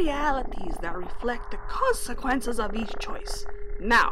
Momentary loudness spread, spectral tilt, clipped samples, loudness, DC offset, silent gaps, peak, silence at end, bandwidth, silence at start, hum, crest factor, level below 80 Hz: 11 LU; -3.5 dB/octave; under 0.1%; -29 LUFS; under 0.1%; none; -10 dBFS; 0 s; 14 kHz; 0 s; none; 16 dB; -34 dBFS